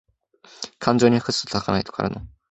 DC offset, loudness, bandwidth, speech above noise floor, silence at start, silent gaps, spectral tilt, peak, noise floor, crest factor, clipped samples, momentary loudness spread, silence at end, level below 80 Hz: under 0.1%; -22 LUFS; 8.2 kHz; 32 dB; 0.6 s; none; -5 dB/octave; -2 dBFS; -53 dBFS; 22 dB; under 0.1%; 18 LU; 0.25 s; -48 dBFS